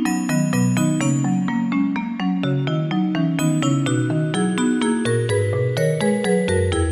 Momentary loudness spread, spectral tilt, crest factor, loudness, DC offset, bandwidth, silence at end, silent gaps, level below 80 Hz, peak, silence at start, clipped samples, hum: 2 LU; -6 dB/octave; 12 dB; -20 LUFS; under 0.1%; 13.5 kHz; 0 s; none; -44 dBFS; -6 dBFS; 0 s; under 0.1%; none